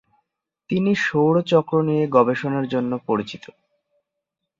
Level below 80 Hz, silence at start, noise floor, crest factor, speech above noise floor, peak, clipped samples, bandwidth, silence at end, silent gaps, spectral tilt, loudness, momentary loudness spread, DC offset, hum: -64 dBFS; 0.7 s; -81 dBFS; 20 dB; 62 dB; -2 dBFS; under 0.1%; 7.6 kHz; 1.2 s; none; -7 dB/octave; -20 LUFS; 8 LU; under 0.1%; none